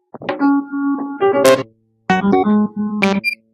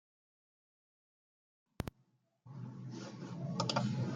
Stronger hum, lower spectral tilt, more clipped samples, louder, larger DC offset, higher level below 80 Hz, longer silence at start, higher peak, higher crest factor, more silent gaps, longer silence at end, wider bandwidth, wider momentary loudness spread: neither; about the same, -5.5 dB/octave vs -5.5 dB/octave; neither; first, -16 LUFS vs -41 LUFS; neither; first, -58 dBFS vs -64 dBFS; second, 0.15 s vs 1.8 s; first, 0 dBFS vs -18 dBFS; second, 16 dB vs 26 dB; neither; first, 0.2 s vs 0 s; about the same, 15.5 kHz vs 16 kHz; second, 8 LU vs 14 LU